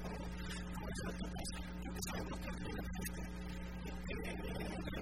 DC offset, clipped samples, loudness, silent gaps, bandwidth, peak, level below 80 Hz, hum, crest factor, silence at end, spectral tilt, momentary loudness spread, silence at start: 0.2%; under 0.1%; -45 LUFS; none; 16 kHz; -26 dBFS; -48 dBFS; none; 16 dB; 0 s; -5 dB/octave; 4 LU; 0 s